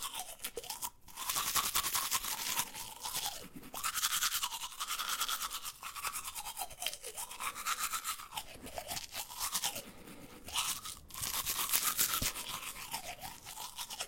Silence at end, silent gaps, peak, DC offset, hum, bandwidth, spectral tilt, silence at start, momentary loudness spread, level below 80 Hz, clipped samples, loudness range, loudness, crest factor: 0 s; none; -10 dBFS; under 0.1%; none; 17 kHz; 0.5 dB/octave; 0 s; 13 LU; -60 dBFS; under 0.1%; 5 LU; -36 LUFS; 28 dB